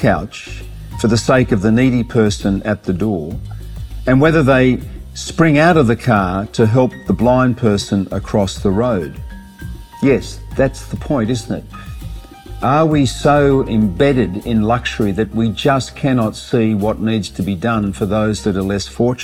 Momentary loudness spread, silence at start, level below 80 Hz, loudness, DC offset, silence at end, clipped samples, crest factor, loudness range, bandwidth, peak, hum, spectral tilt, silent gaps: 18 LU; 0 s; -32 dBFS; -15 LUFS; under 0.1%; 0 s; under 0.1%; 14 dB; 5 LU; 16 kHz; 0 dBFS; none; -6.5 dB/octave; none